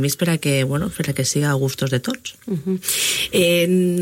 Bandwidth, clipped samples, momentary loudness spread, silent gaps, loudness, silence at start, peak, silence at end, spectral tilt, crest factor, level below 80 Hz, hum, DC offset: 16.5 kHz; under 0.1%; 9 LU; none; -19 LUFS; 0 s; -4 dBFS; 0 s; -4.5 dB/octave; 16 dB; -50 dBFS; none; under 0.1%